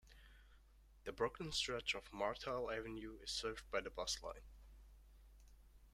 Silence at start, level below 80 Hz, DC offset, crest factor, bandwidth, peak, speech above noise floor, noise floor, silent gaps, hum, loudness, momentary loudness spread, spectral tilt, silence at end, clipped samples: 0.05 s; -62 dBFS; under 0.1%; 22 dB; 16 kHz; -24 dBFS; 22 dB; -67 dBFS; none; none; -44 LUFS; 23 LU; -2.5 dB/octave; 0.05 s; under 0.1%